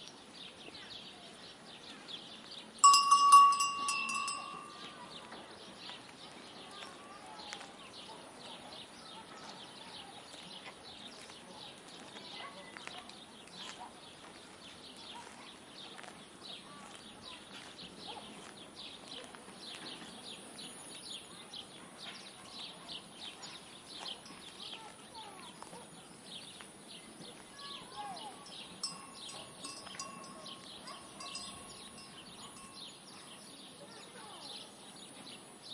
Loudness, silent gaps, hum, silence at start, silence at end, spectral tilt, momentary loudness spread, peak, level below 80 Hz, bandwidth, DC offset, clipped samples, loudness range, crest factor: -35 LUFS; none; none; 0 s; 0 s; -0.5 dB/octave; 10 LU; -10 dBFS; -78 dBFS; 11.5 kHz; under 0.1%; under 0.1%; 21 LU; 28 dB